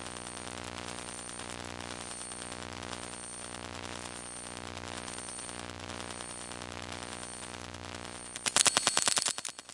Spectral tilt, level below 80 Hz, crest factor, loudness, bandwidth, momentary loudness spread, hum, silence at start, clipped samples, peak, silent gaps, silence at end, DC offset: -1 dB/octave; -64 dBFS; 36 dB; -35 LUFS; 11.5 kHz; 15 LU; none; 0 s; under 0.1%; -2 dBFS; none; 0 s; under 0.1%